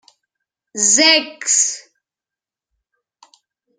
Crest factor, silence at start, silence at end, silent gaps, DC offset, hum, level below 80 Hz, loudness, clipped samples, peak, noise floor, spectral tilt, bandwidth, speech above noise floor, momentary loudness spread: 20 dB; 0.75 s; 2 s; none; under 0.1%; none; -72 dBFS; -13 LUFS; under 0.1%; 0 dBFS; -89 dBFS; 1 dB/octave; 12 kHz; 73 dB; 18 LU